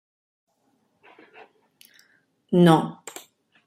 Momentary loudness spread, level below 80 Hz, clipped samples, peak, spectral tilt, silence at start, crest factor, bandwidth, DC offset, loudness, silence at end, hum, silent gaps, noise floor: 24 LU; -68 dBFS; under 0.1%; -4 dBFS; -7 dB/octave; 2.5 s; 22 dB; 15 kHz; under 0.1%; -20 LUFS; 0.75 s; none; none; -69 dBFS